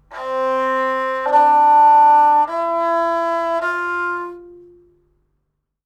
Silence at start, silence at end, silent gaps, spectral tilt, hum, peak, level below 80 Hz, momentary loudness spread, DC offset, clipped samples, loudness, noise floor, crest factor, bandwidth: 0.1 s; 1.35 s; none; -3.5 dB/octave; none; -4 dBFS; -60 dBFS; 12 LU; under 0.1%; under 0.1%; -15 LUFS; -72 dBFS; 14 dB; 9 kHz